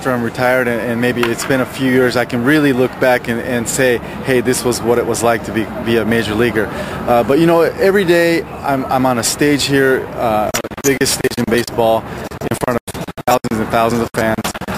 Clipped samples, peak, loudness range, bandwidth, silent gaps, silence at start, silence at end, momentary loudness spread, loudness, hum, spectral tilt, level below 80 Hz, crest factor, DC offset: under 0.1%; 0 dBFS; 3 LU; 15.5 kHz; 12.81-12.87 s; 0 s; 0 s; 7 LU; -15 LUFS; none; -4.5 dB/octave; -40 dBFS; 14 dB; under 0.1%